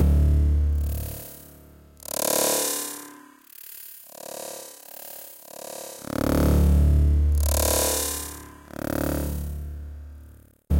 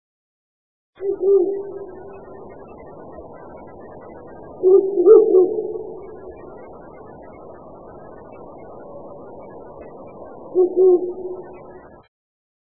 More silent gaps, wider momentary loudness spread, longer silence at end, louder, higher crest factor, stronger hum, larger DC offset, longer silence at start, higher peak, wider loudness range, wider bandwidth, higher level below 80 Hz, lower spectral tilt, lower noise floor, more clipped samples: neither; second, 20 LU vs 25 LU; second, 0 s vs 1 s; second, -24 LUFS vs -17 LUFS; second, 16 dB vs 22 dB; neither; second, under 0.1% vs 0.4%; second, 0 s vs 1 s; second, -10 dBFS vs 0 dBFS; second, 10 LU vs 21 LU; first, 17 kHz vs 2.6 kHz; first, -26 dBFS vs -56 dBFS; second, -5 dB/octave vs -13 dB/octave; first, -49 dBFS vs -40 dBFS; neither